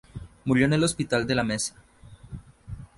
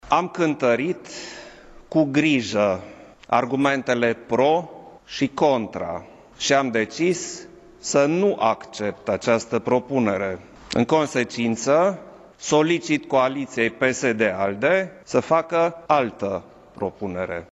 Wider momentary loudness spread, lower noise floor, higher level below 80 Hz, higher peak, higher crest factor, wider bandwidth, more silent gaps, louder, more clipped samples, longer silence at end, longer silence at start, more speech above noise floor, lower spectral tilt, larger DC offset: first, 22 LU vs 11 LU; about the same, -44 dBFS vs -44 dBFS; first, -48 dBFS vs -58 dBFS; second, -8 dBFS vs -4 dBFS; about the same, 20 dB vs 20 dB; first, 11.5 kHz vs 10 kHz; neither; second, -25 LUFS vs -22 LUFS; neither; about the same, 0.15 s vs 0.05 s; about the same, 0.15 s vs 0.05 s; about the same, 20 dB vs 22 dB; about the same, -5 dB/octave vs -4.5 dB/octave; neither